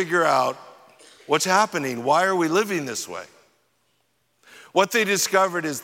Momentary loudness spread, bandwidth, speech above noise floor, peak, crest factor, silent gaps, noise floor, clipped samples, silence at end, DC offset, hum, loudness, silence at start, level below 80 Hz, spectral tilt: 10 LU; 17 kHz; 47 dB; -4 dBFS; 20 dB; none; -69 dBFS; under 0.1%; 0 s; under 0.1%; none; -21 LUFS; 0 s; -78 dBFS; -3 dB/octave